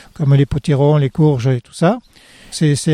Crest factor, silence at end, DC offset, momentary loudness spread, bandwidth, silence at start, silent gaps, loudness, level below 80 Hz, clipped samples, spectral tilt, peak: 12 dB; 0 s; under 0.1%; 5 LU; 11.5 kHz; 0.2 s; none; -15 LUFS; -40 dBFS; under 0.1%; -7 dB/octave; -2 dBFS